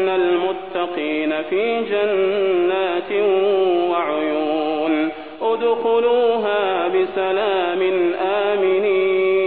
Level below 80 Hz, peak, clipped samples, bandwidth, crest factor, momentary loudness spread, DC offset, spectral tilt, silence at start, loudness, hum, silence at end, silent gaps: -62 dBFS; -6 dBFS; under 0.1%; 4.4 kHz; 12 dB; 5 LU; 0.4%; -8.5 dB/octave; 0 s; -19 LUFS; none; 0 s; none